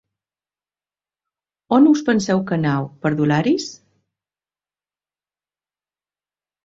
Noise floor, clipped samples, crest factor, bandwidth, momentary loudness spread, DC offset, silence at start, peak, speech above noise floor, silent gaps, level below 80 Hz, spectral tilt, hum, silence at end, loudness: under -90 dBFS; under 0.1%; 20 dB; 8 kHz; 9 LU; under 0.1%; 1.7 s; -2 dBFS; over 73 dB; none; -62 dBFS; -6.5 dB/octave; 50 Hz at -45 dBFS; 2.9 s; -18 LUFS